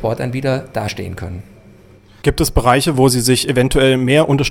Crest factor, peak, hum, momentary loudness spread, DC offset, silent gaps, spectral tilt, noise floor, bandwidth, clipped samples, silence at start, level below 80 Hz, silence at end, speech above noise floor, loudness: 16 dB; 0 dBFS; none; 14 LU; under 0.1%; none; -5 dB/octave; -44 dBFS; 17 kHz; under 0.1%; 0 s; -30 dBFS; 0 s; 29 dB; -15 LUFS